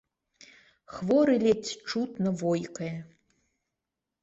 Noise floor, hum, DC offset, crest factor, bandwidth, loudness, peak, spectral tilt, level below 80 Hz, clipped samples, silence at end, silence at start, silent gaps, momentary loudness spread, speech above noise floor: -87 dBFS; none; under 0.1%; 18 dB; 8 kHz; -28 LUFS; -12 dBFS; -6 dB/octave; -68 dBFS; under 0.1%; 1.15 s; 0.9 s; none; 14 LU; 59 dB